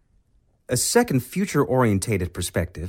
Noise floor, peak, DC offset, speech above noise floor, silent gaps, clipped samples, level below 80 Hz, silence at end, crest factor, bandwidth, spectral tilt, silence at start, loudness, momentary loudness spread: -62 dBFS; -6 dBFS; under 0.1%; 40 dB; none; under 0.1%; -44 dBFS; 0 s; 18 dB; 17 kHz; -5 dB/octave; 0.7 s; -22 LUFS; 7 LU